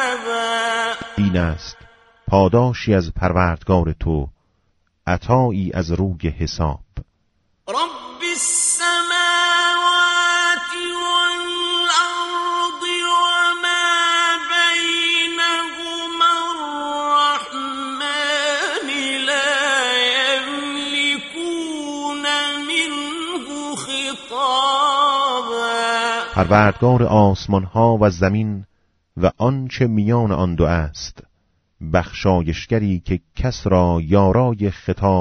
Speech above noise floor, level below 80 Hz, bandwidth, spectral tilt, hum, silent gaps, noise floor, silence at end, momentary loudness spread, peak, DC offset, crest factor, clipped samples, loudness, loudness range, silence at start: 47 dB; -38 dBFS; 11.5 kHz; -4 dB/octave; none; none; -65 dBFS; 0 s; 10 LU; 0 dBFS; under 0.1%; 18 dB; under 0.1%; -18 LUFS; 5 LU; 0 s